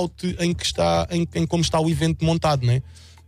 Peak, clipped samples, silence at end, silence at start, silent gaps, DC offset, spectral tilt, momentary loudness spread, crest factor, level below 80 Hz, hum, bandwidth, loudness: -8 dBFS; under 0.1%; 0.3 s; 0 s; none; under 0.1%; -5.5 dB/octave; 4 LU; 14 dB; -40 dBFS; none; 14 kHz; -22 LUFS